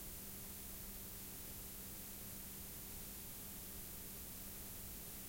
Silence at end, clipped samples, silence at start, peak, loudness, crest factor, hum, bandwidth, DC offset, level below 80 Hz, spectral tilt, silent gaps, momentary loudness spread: 0 s; under 0.1%; 0 s; -38 dBFS; -49 LUFS; 14 dB; none; 16.5 kHz; under 0.1%; -60 dBFS; -3 dB/octave; none; 0 LU